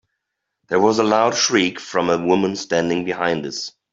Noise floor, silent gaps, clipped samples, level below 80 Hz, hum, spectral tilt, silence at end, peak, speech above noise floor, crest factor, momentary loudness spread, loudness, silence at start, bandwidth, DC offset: -78 dBFS; none; under 0.1%; -60 dBFS; none; -3.5 dB/octave; 0.25 s; -2 dBFS; 60 dB; 16 dB; 7 LU; -19 LUFS; 0.7 s; 7.8 kHz; under 0.1%